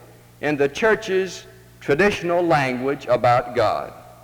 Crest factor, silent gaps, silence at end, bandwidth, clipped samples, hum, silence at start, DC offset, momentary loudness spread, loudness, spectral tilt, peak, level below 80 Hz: 14 dB; none; 0.1 s; over 20 kHz; under 0.1%; none; 0.4 s; under 0.1%; 11 LU; -20 LUFS; -5.5 dB/octave; -6 dBFS; -50 dBFS